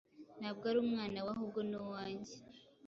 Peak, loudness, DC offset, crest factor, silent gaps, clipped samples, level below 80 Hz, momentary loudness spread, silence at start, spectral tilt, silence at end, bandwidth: -24 dBFS; -40 LUFS; under 0.1%; 18 dB; none; under 0.1%; -74 dBFS; 19 LU; 0.15 s; -4.5 dB/octave; 0 s; 7.6 kHz